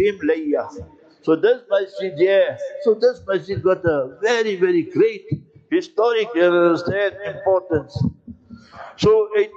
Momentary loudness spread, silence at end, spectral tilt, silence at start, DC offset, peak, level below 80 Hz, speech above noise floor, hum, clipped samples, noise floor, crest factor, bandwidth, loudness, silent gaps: 9 LU; 0.1 s; -6.5 dB/octave; 0 s; under 0.1%; -6 dBFS; -52 dBFS; 23 dB; none; under 0.1%; -41 dBFS; 14 dB; 7.8 kHz; -19 LUFS; none